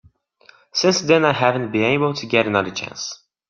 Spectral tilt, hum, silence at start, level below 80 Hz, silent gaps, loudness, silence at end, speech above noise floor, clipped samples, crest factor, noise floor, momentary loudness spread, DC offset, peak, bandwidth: -4.5 dB/octave; none; 0.75 s; -60 dBFS; none; -19 LUFS; 0.35 s; 34 dB; under 0.1%; 18 dB; -53 dBFS; 12 LU; under 0.1%; -2 dBFS; 7.4 kHz